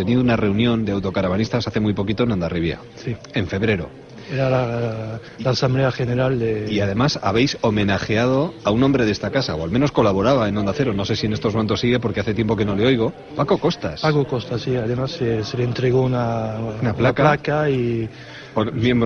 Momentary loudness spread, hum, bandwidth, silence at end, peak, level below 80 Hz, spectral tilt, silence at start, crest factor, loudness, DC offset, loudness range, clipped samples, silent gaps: 7 LU; none; 6.8 kHz; 0 s; -2 dBFS; -42 dBFS; -7 dB/octave; 0 s; 16 dB; -20 LUFS; under 0.1%; 3 LU; under 0.1%; none